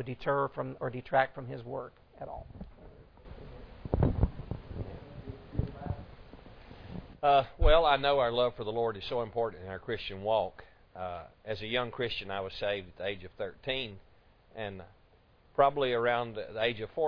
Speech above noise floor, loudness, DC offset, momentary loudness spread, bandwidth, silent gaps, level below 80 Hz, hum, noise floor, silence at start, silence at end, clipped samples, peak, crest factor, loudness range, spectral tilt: 32 dB; -32 LUFS; under 0.1%; 23 LU; 5.4 kHz; none; -42 dBFS; none; -63 dBFS; 0 s; 0 s; under 0.1%; -10 dBFS; 22 dB; 8 LU; -3.5 dB/octave